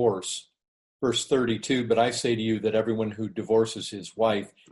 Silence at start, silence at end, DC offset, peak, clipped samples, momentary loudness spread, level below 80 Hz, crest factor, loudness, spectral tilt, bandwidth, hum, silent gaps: 0 s; 0.25 s; under 0.1%; -10 dBFS; under 0.1%; 10 LU; -62 dBFS; 16 dB; -26 LUFS; -4.5 dB/octave; 11.5 kHz; none; 0.68-1.00 s